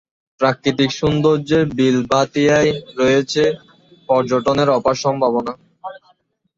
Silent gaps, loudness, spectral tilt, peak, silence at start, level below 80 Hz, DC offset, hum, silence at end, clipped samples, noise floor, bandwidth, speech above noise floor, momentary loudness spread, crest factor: none; -17 LUFS; -5.5 dB/octave; -2 dBFS; 0.4 s; -48 dBFS; under 0.1%; none; 0.6 s; under 0.1%; -59 dBFS; 7.8 kHz; 43 dB; 11 LU; 16 dB